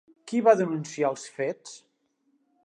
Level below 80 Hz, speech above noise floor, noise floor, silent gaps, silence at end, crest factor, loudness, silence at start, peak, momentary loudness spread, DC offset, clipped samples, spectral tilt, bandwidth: -84 dBFS; 46 dB; -71 dBFS; none; 0.9 s; 22 dB; -26 LUFS; 0.25 s; -6 dBFS; 14 LU; under 0.1%; under 0.1%; -5.5 dB/octave; 10.5 kHz